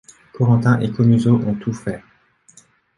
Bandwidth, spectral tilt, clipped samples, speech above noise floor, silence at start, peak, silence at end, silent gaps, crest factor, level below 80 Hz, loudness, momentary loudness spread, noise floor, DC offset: 11 kHz; -8.5 dB/octave; under 0.1%; 37 dB; 0.35 s; -2 dBFS; 1 s; none; 16 dB; -50 dBFS; -18 LUFS; 13 LU; -53 dBFS; under 0.1%